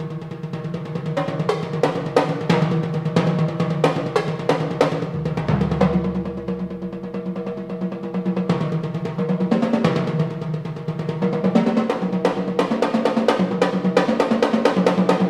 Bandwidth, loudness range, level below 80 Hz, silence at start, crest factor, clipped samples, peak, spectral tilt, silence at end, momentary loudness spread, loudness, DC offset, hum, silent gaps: 11.5 kHz; 4 LU; -48 dBFS; 0 s; 18 dB; under 0.1%; -2 dBFS; -7.5 dB/octave; 0 s; 9 LU; -21 LUFS; under 0.1%; none; none